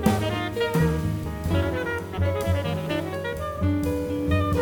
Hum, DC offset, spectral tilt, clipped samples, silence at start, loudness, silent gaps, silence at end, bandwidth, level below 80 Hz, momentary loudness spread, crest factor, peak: none; under 0.1%; -6.5 dB/octave; under 0.1%; 0 s; -26 LUFS; none; 0 s; 19 kHz; -38 dBFS; 6 LU; 18 dB; -6 dBFS